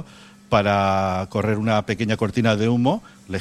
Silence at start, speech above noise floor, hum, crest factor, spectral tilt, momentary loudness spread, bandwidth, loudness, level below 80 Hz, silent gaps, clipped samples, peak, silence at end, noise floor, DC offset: 0 s; 23 dB; none; 16 dB; -6.5 dB/octave; 5 LU; 12.5 kHz; -21 LUFS; -50 dBFS; none; under 0.1%; -6 dBFS; 0 s; -44 dBFS; under 0.1%